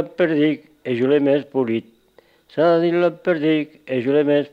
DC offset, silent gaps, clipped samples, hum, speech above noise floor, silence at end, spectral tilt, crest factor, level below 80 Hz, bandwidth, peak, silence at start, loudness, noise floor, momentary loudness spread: under 0.1%; none; under 0.1%; none; 37 dB; 0.05 s; -8.5 dB/octave; 14 dB; -70 dBFS; 5.4 kHz; -6 dBFS; 0 s; -19 LUFS; -55 dBFS; 9 LU